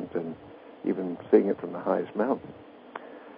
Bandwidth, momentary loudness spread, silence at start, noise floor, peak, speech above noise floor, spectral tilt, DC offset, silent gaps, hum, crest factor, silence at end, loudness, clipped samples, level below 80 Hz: 5 kHz; 22 LU; 0 s; -48 dBFS; -6 dBFS; 21 dB; -11 dB/octave; under 0.1%; none; none; 22 dB; 0 s; -28 LUFS; under 0.1%; -70 dBFS